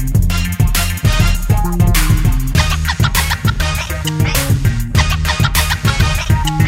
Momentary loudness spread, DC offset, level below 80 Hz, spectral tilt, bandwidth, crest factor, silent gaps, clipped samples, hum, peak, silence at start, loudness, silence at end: 3 LU; under 0.1%; -18 dBFS; -4.5 dB/octave; 16.5 kHz; 14 dB; none; under 0.1%; none; 0 dBFS; 0 s; -15 LUFS; 0 s